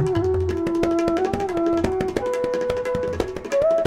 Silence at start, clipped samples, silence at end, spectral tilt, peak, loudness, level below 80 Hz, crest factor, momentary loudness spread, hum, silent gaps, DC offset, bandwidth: 0 s; under 0.1%; 0 s; -7 dB/octave; -6 dBFS; -23 LUFS; -40 dBFS; 16 dB; 3 LU; none; none; under 0.1%; 13 kHz